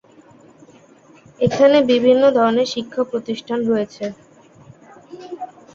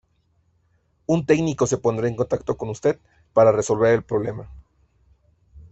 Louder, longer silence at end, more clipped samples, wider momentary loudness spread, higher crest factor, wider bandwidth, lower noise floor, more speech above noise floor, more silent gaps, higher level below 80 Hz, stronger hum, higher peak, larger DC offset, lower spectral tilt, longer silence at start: first, -17 LUFS vs -21 LUFS; first, 0.3 s vs 0.05 s; neither; first, 20 LU vs 12 LU; about the same, 18 dB vs 18 dB; about the same, 7.6 kHz vs 8.2 kHz; second, -48 dBFS vs -65 dBFS; second, 32 dB vs 45 dB; neither; second, -58 dBFS vs -52 dBFS; neither; about the same, -2 dBFS vs -4 dBFS; neither; about the same, -5.5 dB/octave vs -6.5 dB/octave; first, 1.4 s vs 1.1 s